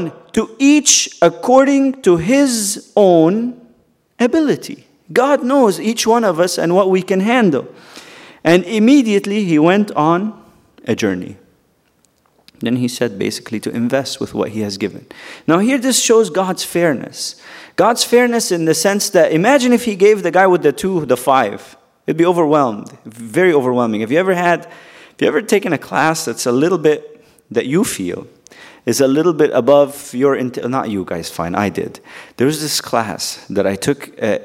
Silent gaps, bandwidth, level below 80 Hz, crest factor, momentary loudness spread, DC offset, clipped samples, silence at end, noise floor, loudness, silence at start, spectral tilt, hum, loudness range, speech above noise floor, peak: none; 16 kHz; -56 dBFS; 16 dB; 12 LU; under 0.1%; under 0.1%; 0 s; -58 dBFS; -15 LUFS; 0 s; -4 dB/octave; none; 6 LU; 44 dB; 0 dBFS